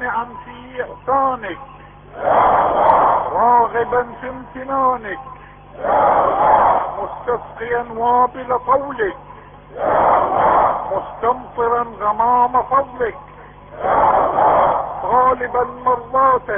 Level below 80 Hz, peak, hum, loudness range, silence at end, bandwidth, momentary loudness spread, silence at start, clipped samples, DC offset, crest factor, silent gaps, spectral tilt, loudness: -44 dBFS; -2 dBFS; none; 2 LU; 0 s; 3.7 kHz; 14 LU; 0 s; under 0.1%; under 0.1%; 16 dB; none; -9.5 dB/octave; -17 LUFS